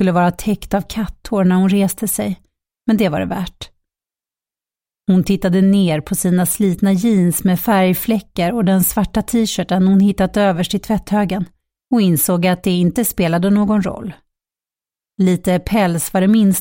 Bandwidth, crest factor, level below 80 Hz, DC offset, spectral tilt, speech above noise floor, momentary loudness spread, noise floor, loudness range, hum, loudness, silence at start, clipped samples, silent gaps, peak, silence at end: 17 kHz; 12 dB; -40 dBFS; under 0.1%; -6 dB/octave; over 75 dB; 10 LU; under -90 dBFS; 4 LU; none; -16 LUFS; 0 s; under 0.1%; none; -2 dBFS; 0 s